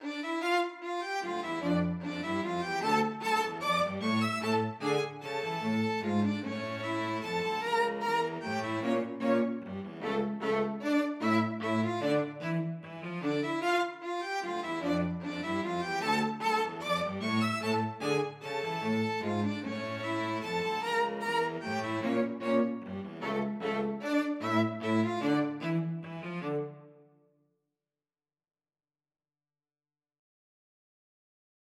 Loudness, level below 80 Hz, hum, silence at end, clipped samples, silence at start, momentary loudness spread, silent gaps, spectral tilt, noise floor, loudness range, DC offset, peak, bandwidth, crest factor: -32 LUFS; -72 dBFS; none; 4.8 s; under 0.1%; 0 s; 6 LU; none; -5.5 dB/octave; under -90 dBFS; 2 LU; under 0.1%; -14 dBFS; 15 kHz; 18 dB